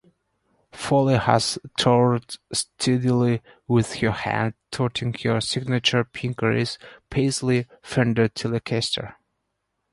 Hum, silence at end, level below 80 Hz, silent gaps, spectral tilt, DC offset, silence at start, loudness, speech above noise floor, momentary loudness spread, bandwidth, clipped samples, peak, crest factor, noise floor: none; 0.8 s; -52 dBFS; none; -5 dB/octave; under 0.1%; 0.75 s; -23 LUFS; 54 dB; 9 LU; 11.5 kHz; under 0.1%; -2 dBFS; 22 dB; -77 dBFS